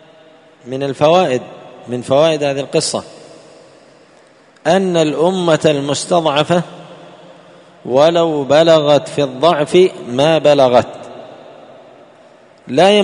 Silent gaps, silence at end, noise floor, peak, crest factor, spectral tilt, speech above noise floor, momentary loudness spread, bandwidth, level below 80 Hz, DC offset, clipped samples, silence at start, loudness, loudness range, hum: none; 0 s; -46 dBFS; 0 dBFS; 14 dB; -5 dB/octave; 34 dB; 17 LU; 11 kHz; -58 dBFS; under 0.1%; under 0.1%; 0.65 s; -13 LUFS; 5 LU; none